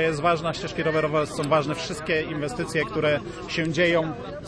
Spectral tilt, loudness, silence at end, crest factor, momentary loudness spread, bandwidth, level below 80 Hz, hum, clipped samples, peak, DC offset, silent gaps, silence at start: -5 dB/octave; -25 LUFS; 0 s; 18 dB; 7 LU; 11 kHz; -50 dBFS; none; under 0.1%; -8 dBFS; under 0.1%; none; 0 s